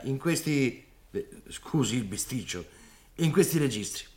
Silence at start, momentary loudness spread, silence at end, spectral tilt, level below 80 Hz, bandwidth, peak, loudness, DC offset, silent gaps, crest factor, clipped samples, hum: 0 s; 18 LU; 0.1 s; -5 dB/octave; -56 dBFS; 17 kHz; -10 dBFS; -29 LUFS; under 0.1%; none; 20 dB; under 0.1%; none